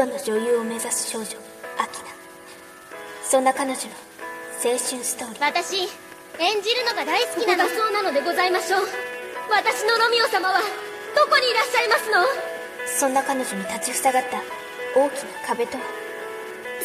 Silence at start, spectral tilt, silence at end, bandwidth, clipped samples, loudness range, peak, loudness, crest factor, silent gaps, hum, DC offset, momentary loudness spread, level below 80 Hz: 0 s; -1 dB/octave; 0 s; 14 kHz; under 0.1%; 6 LU; -4 dBFS; -22 LUFS; 18 dB; none; none; under 0.1%; 15 LU; -68 dBFS